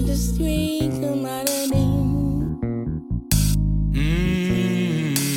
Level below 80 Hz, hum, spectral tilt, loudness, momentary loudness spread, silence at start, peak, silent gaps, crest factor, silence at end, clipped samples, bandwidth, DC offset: -28 dBFS; none; -5.5 dB/octave; -22 LUFS; 6 LU; 0 s; -6 dBFS; none; 14 dB; 0 s; under 0.1%; 17 kHz; under 0.1%